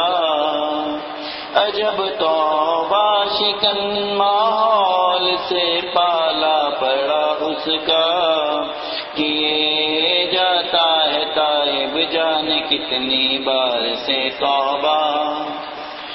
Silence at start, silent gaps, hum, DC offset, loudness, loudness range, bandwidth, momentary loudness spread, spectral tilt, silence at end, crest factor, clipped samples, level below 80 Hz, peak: 0 s; none; none; under 0.1%; -17 LUFS; 2 LU; 6 kHz; 6 LU; -5.5 dB/octave; 0 s; 18 dB; under 0.1%; -58 dBFS; 0 dBFS